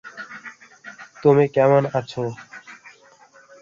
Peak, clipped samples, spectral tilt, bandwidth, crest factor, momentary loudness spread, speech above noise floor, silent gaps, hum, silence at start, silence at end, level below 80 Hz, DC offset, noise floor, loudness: -4 dBFS; under 0.1%; -7.5 dB/octave; 7.4 kHz; 20 dB; 25 LU; 34 dB; none; none; 0.05 s; 0.85 s; -64 dBFS; under 0.1%; -51 dBFS; -19 LUFS